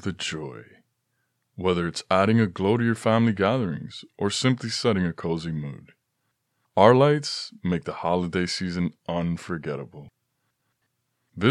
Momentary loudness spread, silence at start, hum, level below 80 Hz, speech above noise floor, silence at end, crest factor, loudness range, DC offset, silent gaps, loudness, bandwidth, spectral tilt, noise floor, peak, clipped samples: 14 LU; 0.05 s; none; -56 dBFS; 52 dB; 0 s; 24 dB; 6 LU; under 0.1%; none; -24 LUFS; 11.5 kHz; -6 dB/octave; -76 dBFS; -2 dBFS; under 0.1%